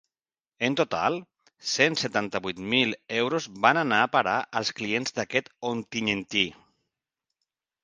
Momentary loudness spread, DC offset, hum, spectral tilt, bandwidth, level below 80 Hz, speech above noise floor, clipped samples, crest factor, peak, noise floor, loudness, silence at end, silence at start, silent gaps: 8 LU; under 0.1%; none; -3.5 dB/octave; 10 kHz; -66 dBFS; over 64 dB; under 0.1%; 26 dB; -2 dBFS; under -90 dBFS; -26 LUFS; 1.3 s; 0.6 s; none